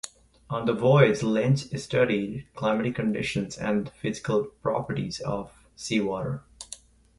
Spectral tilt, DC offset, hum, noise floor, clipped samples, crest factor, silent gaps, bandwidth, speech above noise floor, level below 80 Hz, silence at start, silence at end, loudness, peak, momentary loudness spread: -6 dB/octave; under 0.1%; none; -48 dBFS; under 0.1%; 22 dB; none; 11.5 kHz; 22 dB; -56 dBFS; 0.05 s; 0.45 s; -26 LUFS; -4 dBFS; 17 LU